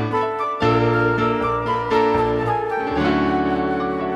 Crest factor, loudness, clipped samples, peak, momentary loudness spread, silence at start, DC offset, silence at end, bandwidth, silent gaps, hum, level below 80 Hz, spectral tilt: 14 dB; -20 LUFS; under 0.1%; -6 dBFS; 5 LU; 0 s; under 0.1%; 0 s; 8.8 kHz; none; none; -40 dBFS; -7.5 dB/octave